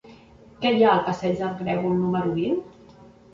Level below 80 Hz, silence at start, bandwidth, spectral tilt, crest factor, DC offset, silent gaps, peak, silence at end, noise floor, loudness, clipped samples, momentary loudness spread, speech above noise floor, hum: -56 dBFS; 0.05 s; 7.6 kHz; -7.5 dB/octave; 18 dB; under 0.1%; none; -6 dBFS; 0.65 s; -49 dBFS; -23 LUFS; under 0.1%; 8 LU; 27 dB; none